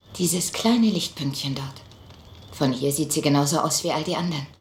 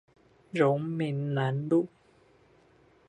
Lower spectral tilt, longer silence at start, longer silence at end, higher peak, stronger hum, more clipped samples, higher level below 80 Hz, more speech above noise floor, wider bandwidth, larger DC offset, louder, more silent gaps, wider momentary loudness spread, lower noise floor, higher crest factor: second, -4.5 dB/octave vs -8.5 dB/octave; second, 0.1 s vs 0.55 s; second, 0.1 s vs 1.2 s; about the same, -8 dBFS vs -10 dBFS; neither; neither; first, -56 dBFS vs -72 dBFS; second, 23 dB vs 34 dB; first, 16.5 kHz vs 9.2 kHz; neither; first, -23 LUFS vs -29 LUFS; neither; about the same, 9 LU vs 7 LU; second, -46 dBFS vs -62 dBFS; about the same, 16 dB vs 20 dB